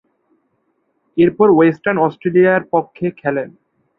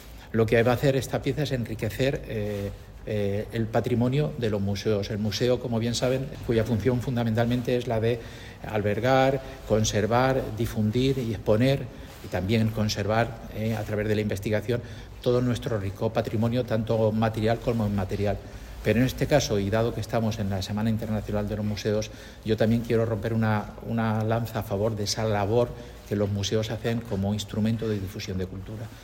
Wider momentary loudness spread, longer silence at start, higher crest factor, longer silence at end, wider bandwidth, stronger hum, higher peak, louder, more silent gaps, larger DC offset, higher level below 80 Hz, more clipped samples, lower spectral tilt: first, 13 LU vs 8 LU; first, 1.15 s vs 0 s; about the same, 16 dB vs 18 dB; first, 0.5 s vs 0 s; second, 4 kHz vs 16.5 kHz; neither; first, -2 dBFS vs -8 dBFS; first, -15 LUFS vs -26 LUFS; neither; neither; second, -56 dBFS vs -44 dBFS; neither; first, -10 dB/octave vs -6 dB/octave